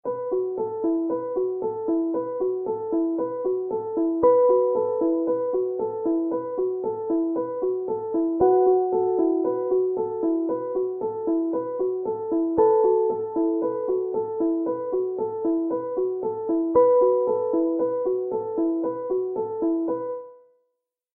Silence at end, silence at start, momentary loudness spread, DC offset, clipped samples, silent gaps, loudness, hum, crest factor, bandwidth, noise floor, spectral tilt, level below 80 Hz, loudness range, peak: 0.8 s; 0.05 s; 8 LU; under 0.1%; under 0.1%; none; -24 LUFS; none; 16 dB; 2.1 kHz; -78 dBFS; -13.5 dB/octave; -64 dBFS; 3 LU; -8 dBFS